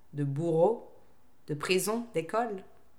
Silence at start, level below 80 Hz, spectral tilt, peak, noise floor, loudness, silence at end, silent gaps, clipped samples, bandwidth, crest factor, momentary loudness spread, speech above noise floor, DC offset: 0.15 s; -72 dBFS; -5 dB/octave; -12 dBFS; -65 dBFS; -31 LUFS; 0.35 s; none; under 0.1%; 18.5 kHz; 18 dB; 11 LU; 35 dB; 0.3%